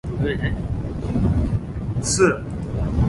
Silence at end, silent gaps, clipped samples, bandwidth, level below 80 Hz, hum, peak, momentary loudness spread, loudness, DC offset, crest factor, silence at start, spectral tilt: 0 s; none; under 0.1%; 11.5 kHz; -30 dBFS; none; -4 dBFS; 9 LU; -23 LUFS; under 0.1%; 18 dB; 0.05 s; -5.5 dB/octave